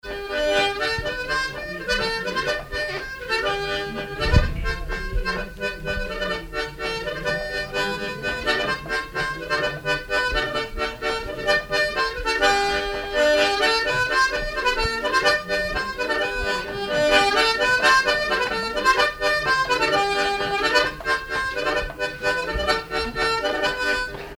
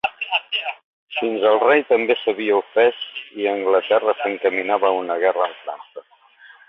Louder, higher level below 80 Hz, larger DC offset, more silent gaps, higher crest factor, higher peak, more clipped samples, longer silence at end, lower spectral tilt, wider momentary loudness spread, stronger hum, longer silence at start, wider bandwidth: second, -22 LUFS vs -19 LUFS; first, -36 dBFS vs -70 dBFS; neither; second, none vs 0.84-1.07 s; about the same, 20 dB vs 16 dB; about the same, -4 dBFS vs -4 dBFS; neither; second, 0 s vs 0.7 s; second, -3.5 dB/octave vs -6 dB/octave; second, 9 LU vs 14 LU; neither; about the same, 0.05 s vs 0.05 s; first, over 20 kHz vs 5.4 kHz